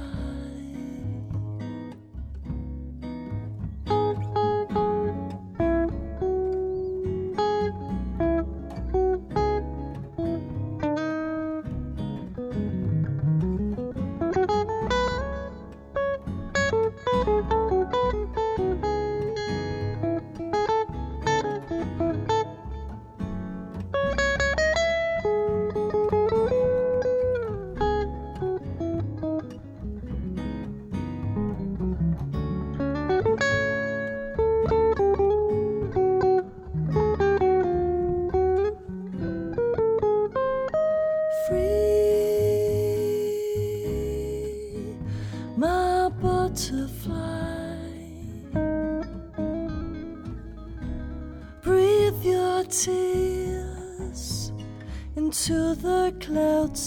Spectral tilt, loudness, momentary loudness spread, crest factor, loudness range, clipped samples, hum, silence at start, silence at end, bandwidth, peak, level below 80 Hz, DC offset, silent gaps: -6 dB/octave; -26 LUFS; 13 LU; 16 dB; 7 LU; under 0.1%; none; 0 s; 0 s; 18 kHz; -10 dBFS; -38 dBFS; under 0.1%; none